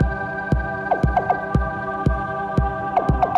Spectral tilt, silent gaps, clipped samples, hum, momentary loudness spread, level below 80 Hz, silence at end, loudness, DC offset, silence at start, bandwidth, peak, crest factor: -8.5 dB/octave; none; under 0.1%; none; 4 LU; -28 dBFS; 0 s; -22 LUFS; under 0.1%; 0 s; 7.2 kHz; -8 dBFS; 14 dB